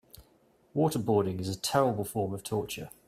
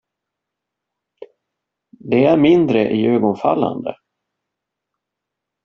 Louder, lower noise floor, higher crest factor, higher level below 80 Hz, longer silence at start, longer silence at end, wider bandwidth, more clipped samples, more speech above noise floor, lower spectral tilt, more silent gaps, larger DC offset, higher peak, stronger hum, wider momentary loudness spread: second, -30 LUFS vs -15 LUFS; second, -65 dBFS vs -81 dBFS; about the same, 20 dB vs 18 dB; about the same, -62 dBFS vs -58 dBFS; second, 0.15 s vs 1.2 s; second, 0.2 s vs 1.7 s; first, 16 kHz vs 6.4 kHz; neither; second, 35 dB vs 67 dB; about the same, -5.5 dB/octave vs -6 dB/octave; neither; neither; second, -10 dBFS vs 0 dBFS; neither; about the same, 7 LU vs 9 LU